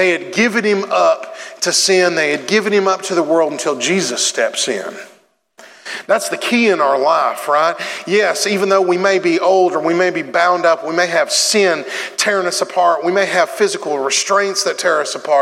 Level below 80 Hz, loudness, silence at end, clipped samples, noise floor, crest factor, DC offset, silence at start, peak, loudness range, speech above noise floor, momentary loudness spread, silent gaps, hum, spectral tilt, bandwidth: -76 dBFS; -15 LUFS; 0 s; under 0.1%; -51 dBFS; 14 dB; under 0.1%; 0 s; -2 dBFS; 3 LU; 36 dB; 5 LU; none; none; -2.5 dB/octave; 16 kHz